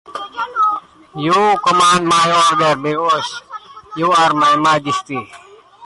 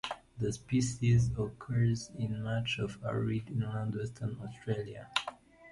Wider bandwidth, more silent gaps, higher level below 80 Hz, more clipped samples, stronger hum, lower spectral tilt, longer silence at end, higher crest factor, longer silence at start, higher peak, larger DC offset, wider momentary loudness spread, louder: about the same, 11.5 kHz vs 11.5 kHz; neither; about the same, -58 dBFS vs -54 dBFS; neither; neither; second, -3.5 dB/octave vs -6 dB/octave; about the same, 0 s vs 0 s; second, 12 dB vs 22 dB; about the same, 0.1 s vs 0.05 s; first, -4 dBFS vs -12 dBFS; neither; first, 16 LU vs 10 LU; first, -14 LUFS vs -34 LUFS